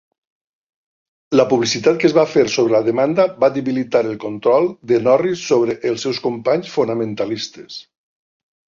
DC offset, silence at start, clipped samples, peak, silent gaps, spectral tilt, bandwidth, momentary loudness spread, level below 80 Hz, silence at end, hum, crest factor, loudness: under 0.1%; 1.3 s; under 0.1%; -2 dBFS; none; -5 dB/octave; 7.6 kHz; 8 LU; -60 dBFS; 0.9 s; none; 16 dB; -17 LUFS